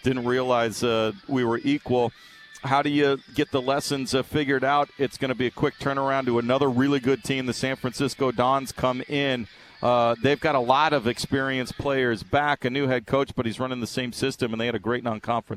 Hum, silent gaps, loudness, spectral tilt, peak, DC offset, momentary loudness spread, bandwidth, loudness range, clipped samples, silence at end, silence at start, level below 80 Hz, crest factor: none; none; -24 LUFS; -5.5 dB/octave; -4 dBFS; under 0.1%; 6 LU; 15 kHz; 2 LU; under 0.1%; 0 s; 0.05 s; -54 dBFS; 20 dB